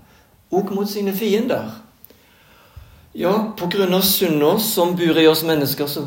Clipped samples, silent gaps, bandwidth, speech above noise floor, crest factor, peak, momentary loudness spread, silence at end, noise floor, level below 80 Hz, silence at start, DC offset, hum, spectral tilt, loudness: under 0.1%; none; 17 kHz; 34 dB; 18 dB; -2 dBFS; 9 LU; 0 s; -52 dBFS; -56 dBFS; 0.5 s; under 0.1%; none; -4.5 dB/octave; -18 LUFS